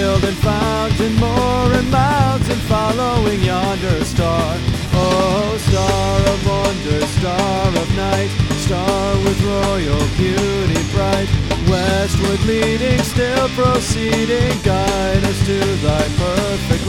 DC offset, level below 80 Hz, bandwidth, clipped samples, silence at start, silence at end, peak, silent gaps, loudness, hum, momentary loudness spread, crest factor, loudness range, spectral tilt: under 0.1%; -26 dBFS; 17 kHz; under 0.1%; 0 s; 0 s; 0 dBFS; none; -16 LUFS; none; 3 LU; 14 dB; 1 LU; -5.5 dB/octave